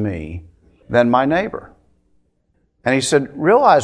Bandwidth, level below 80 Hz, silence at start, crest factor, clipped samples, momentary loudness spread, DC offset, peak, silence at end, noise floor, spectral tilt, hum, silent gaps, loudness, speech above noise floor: 11 kHz; -46 dBFS; 0 s; 18 dB; under 0.1%; 18 LU; under 0.1%; 0 dBFS; 0 s; -64 dBFS; -5 dB/octave; none; none; -17 LUFS; 48 dB